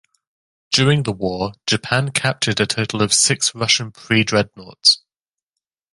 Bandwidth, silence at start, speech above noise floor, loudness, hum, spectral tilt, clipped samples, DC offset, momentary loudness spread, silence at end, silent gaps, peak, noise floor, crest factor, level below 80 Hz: 11.5 kHz; 0.7 s; 71 dB; -17 LUFS; none; -3 dB/octave; under 0.1%; under 0.1%; 8 LU; 0.95 s; none; 0 dBFS; -89 dBFS; 20 dB; -50 dBFS